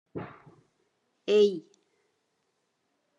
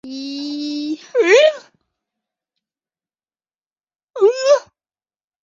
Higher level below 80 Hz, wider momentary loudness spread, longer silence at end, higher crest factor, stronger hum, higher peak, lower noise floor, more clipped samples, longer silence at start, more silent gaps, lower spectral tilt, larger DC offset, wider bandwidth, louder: second, -80 dBFS vs -70 dBFS; first, 19 LU vs 16 LU; first, 1.6 s vs 0.8 s; about the same, 20 dB vs 20 dB; neither; second, -12 dBFS vs 0 dBFS; second, -77 dBFS vs under -90 dBFS; neither; about the same, 0.15 s vs 0.05 s; second, none vs 3.66-3.70 s; first, -5.5 dB/octave vs -1.5 dB/octave; neither; about the same, 7.6 kHz vs 7.6 kHz; second, -25 LUFS vs -16 LUFS